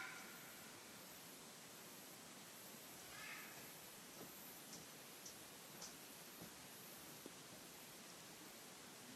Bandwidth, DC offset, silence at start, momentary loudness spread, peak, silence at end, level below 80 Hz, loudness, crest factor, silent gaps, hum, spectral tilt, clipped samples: 15.5 kHz; under 0.1%; 0 s; 3 LU; -40 dBFS; 0 s; -86 dBFS; -56 LUFS; 18 dB; none; none; -2 dB/octave; under 0.1%